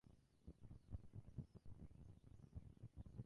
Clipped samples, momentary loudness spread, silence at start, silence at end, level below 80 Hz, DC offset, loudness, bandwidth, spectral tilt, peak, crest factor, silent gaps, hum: under 0.1%; 7 LU; 0.05 s; 0 s; -64 dBFS; under 0.1%; -62 LUFS; 10.5 kHz; -9 dB/octave; -40 dBFS; 20 dB; none; none